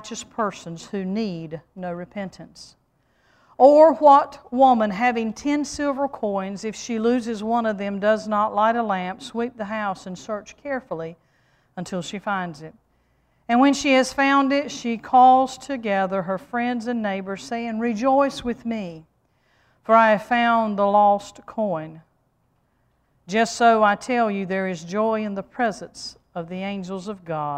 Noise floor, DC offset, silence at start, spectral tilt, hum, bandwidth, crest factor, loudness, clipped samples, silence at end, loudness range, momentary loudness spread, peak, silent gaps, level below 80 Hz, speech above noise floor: -67 dBFS; under 0.1%; 0.05 s; -5 dB/octave; none; 12 kHz; 20 dB; -21 LUFS; under 0.1%; 0 s; 11 LU; 17 LU; -2 dBFS; none; -58 dBFS; 45 dB